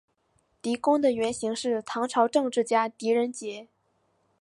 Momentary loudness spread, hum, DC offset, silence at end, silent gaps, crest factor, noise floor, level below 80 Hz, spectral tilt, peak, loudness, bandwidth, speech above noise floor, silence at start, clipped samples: 12 LU; none; under 0.1%; 0.8 s; none; 18 dB; -71 dBFS; -70 dBFS; -3.5 dB/octave; -8 dBFS; -26 LUFS; 11.5 kHz; 45 dB; 0.65 s; under 0.1%